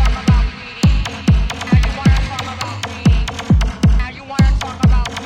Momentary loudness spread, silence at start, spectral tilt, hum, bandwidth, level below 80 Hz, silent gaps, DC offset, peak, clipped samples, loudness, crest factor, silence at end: 8 LU; 0 s; -6 dB/octave; none; 10 kHz; -18 dBFS; none; under 0.1%; -2 dBFS; under 0.1%; -17 LUFS; 12 dB; 0 s